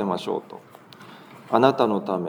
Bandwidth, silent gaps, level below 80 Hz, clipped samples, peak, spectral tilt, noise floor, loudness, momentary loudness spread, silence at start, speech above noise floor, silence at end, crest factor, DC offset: over 20 kHz; none; -78 dBFS; under 0.1%; -2 dBFS; -7 dB/octave; -46 dBFS; -22 LUFS; 25 LU; 0 s; 23 dB; 0 s; 22 dB; under 0.1%